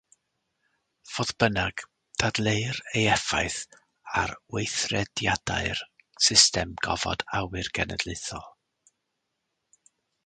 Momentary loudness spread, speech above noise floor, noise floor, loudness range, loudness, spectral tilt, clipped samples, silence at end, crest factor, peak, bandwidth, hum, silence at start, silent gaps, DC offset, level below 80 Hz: 14 LU; 53 dB; -80 dBFS; 7 LU; -26 LUFS; -2.5 dB/octave; under 0.1%; 1.75 s; 26 dB; -2 dBFS; 9.6 kHz; none; 1.05 s; none; under 0.1%; -48 dBFS